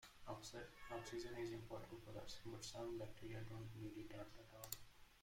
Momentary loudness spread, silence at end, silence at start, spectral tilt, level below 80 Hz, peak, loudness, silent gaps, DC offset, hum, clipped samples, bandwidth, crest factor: 6 LU; 0 s; 0 s; -4.5 dB/octave; -68 dBFS; -28 dBFS; -54 LUFS; none; under 0.1%; none; under 0.1%; 16.5 kHz; 26 dB